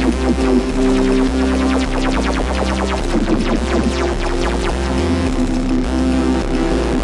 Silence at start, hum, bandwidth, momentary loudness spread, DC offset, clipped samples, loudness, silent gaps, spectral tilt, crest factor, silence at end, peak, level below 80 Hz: 0 s; none; 11.5 kHz; 3 LU; under 0.1%; under 0.1%; -17 LUFS; none; -6 dB/octave; 14 dB; 0 s; -2 dBFS; -22 dBFS